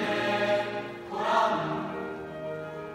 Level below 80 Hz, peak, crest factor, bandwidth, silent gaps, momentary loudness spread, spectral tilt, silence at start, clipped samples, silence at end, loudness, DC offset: -64 dBFS; -12 dBFS; 16 dB; 15 kHz; none; 12 LU; -5 dB/octave; 0 s; under 0.1%; 0 s; -29 LUFS; under 0.1%